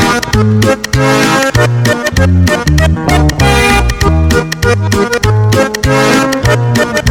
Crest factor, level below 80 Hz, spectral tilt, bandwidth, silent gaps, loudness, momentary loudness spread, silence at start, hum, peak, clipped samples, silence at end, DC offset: 8 dB; -18 dBFS; -5 dB/octave; 18 kHz; none; -10 LUFS; 3 LU; 0 s; none; 0 dBFS; under 0.1%; 0 s; under 0.1%